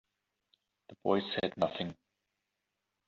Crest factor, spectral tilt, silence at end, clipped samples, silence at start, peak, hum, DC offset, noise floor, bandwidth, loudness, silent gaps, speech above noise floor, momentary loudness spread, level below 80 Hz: 22 dB; -3.5 dB/octave; 1.15 s; under 0.1%; 0.9 s; -16 dBFS; none; under 0.1%; -86 dBFS; 7.4 kHz; -34 LUFS; none; 52 dB; 9 LU; -74 dBFS